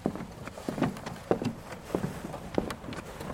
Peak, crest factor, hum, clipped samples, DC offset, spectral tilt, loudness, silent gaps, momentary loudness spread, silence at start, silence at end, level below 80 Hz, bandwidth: -8 dBFS; 26 dB; none; under 0.1%; under 0.1%; -6 dB/octave; -35 LUFS; none; 9 LU; 0 s; 0 s; -52 dBFS; 16.5 kHz